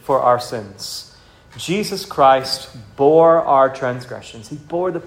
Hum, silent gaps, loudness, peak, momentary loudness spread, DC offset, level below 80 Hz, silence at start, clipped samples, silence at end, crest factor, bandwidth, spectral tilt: none; none; -16 LUFS; 0 dBFS; 20 LU; under 0.1%; -54 dBFS; 0.1 s; under 0.1%; 0 s; 18 dB; 16.5 kHz; -5 dB/octave